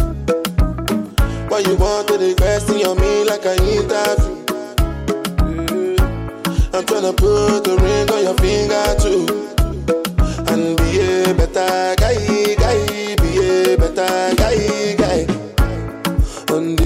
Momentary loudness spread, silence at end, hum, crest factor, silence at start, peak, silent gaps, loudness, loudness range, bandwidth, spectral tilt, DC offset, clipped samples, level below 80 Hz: 5 LU; 0 s; none; 10 dB; 0 s; -6 dBFS; none; -17 LUFS; 2 LU; 16.5 kHz; -5.5 dB/octave; under 0.1%; under 0.1%; -22 dBFS